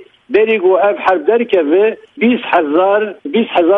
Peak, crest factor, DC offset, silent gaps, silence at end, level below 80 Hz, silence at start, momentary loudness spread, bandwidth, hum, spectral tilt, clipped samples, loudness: 0 dBFS; 12 dB; under 0.1%; none; 0 s; -60 dBFS; 0 s; 5 LU; 5.2 kHz; none; -7 dB/octave; under 0.1%; -13 LUFS